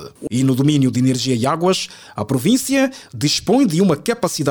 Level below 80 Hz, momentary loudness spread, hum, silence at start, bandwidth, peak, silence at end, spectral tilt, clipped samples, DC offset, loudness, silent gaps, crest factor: -52 dBFS; 7 LU; none; 0 s; 19 kHz; -2 dBFS; 0 s; -5 dB/octave; under 0.1%; under 0.1%; -17 LUFS; none; 14 dB